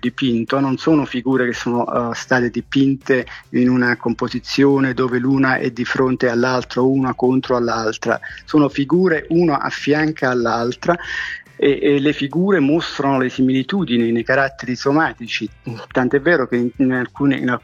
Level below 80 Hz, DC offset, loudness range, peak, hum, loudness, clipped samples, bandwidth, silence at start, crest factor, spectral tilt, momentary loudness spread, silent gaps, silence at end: -50 dBFS; under 0.1%; 1 LU; -2 dBFS; none; -18 LUFS; under 0.1%; 7.4 kHz; 0.05 s; 16 dB; -6.5 dB/octave; 5 LU; none; 0.05 s